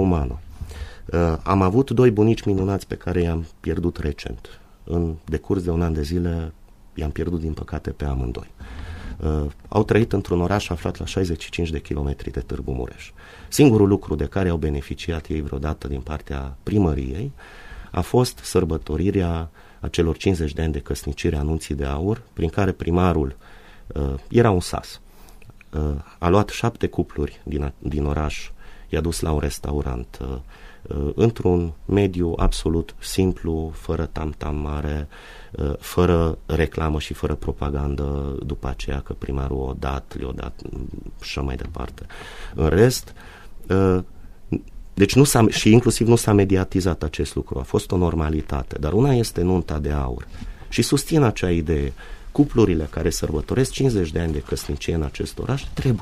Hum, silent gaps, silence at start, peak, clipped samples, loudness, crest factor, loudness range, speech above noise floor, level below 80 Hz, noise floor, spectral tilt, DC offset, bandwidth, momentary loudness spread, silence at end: none; none; 0 s; 0 dBFS; under 0.1%; -22 LUFS; 22 dB; 7 LU; 21 dB; -32 dBFS; -43 dBFS; -6.5 dB/octave; under 0.1%; 15.5 kHz; 15 LU; 0 s